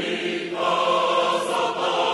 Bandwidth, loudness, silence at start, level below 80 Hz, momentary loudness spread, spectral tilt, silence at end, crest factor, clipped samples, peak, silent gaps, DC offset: 12 kHz; -22 LUFS; 0 s; -66 dBFS; 5 LU; -3 dB/octave; 0 s; 14 dB; under 0.1%; -8 dBFS; none; under 0.1%